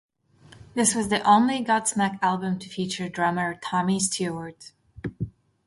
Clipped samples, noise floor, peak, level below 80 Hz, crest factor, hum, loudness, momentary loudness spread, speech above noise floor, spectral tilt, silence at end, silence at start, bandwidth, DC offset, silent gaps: under 0.1%; -53 dBFS; -6 dBFS; -56 dBFS; 18 dB; none; -24 LUFS; 17 LU; 29 dB; -4 dB/octave; 0.4 s; 0.55 s; 12 kHz; under 0.1%; none